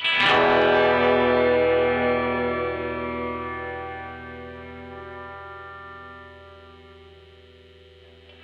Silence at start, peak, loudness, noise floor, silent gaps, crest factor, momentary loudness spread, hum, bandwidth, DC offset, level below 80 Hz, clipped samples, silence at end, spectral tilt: 0 s; -8 dBFS; -21 LUFS; -50 dBFS; none; 18 dB; 21 LU; none; 8.6 kHz; under 0.1%; -50 dBFS; under 0.1%; 1.45 s; -6 dB/octave